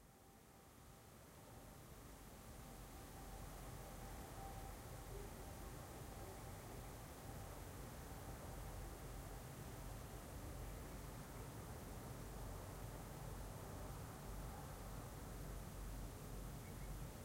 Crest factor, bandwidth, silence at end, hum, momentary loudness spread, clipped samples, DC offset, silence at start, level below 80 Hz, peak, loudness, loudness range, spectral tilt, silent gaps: 14 dB; 16 kHz; 0 s; none; 6 LU; under 0.1%; under 0.1%; 0 s; -58 dBFS; -40 dBFS; -54 LUFS; 3 LU; -5 dB/octave; none